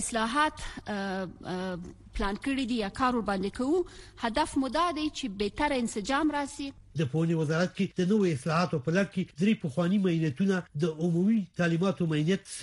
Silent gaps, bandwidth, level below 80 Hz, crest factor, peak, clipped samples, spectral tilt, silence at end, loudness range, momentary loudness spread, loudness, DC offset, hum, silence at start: none; 12 kHz; -50 dBFS; 16 dB; -12 dBFS; under 0.1%; -6 dB/octave; 0 s; 3 LU; 9 LU; -29 LUFS; under 0.1%; none; 0 s